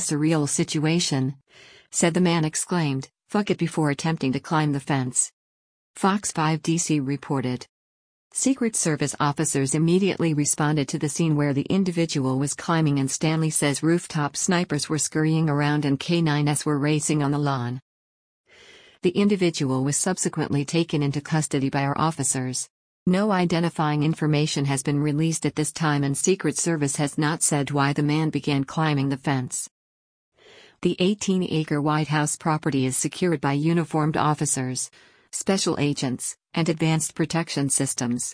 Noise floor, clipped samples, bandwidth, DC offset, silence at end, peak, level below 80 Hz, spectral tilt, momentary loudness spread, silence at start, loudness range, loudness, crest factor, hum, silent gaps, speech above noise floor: -51 dBFS; under 0.1%; 10.5 kHz; under 0.1%; 0 s; -8 dBFS; -60 dBFS; -5 dB/octave; 5 LU; 0 s; 3 LU; -23 LUFS; 16 dB; none; 5.33-5.94 s, 7.69-8.30 s, 17.82-18.44 s, 22.70-23.06 s, 29.71-30.32 s; 28 dB